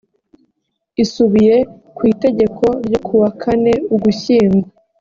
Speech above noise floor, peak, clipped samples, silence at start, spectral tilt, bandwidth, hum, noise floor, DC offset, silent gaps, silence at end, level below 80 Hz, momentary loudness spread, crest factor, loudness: 57 dB; -2 dBFS; under 0.1%; 1 s; -7 dB/octave; 7.4 kHz; none; -70 dBFS; under 0.1%; none; 0.3 s; -48 dBFS; 7 LU; 12 dB; -14 LUFS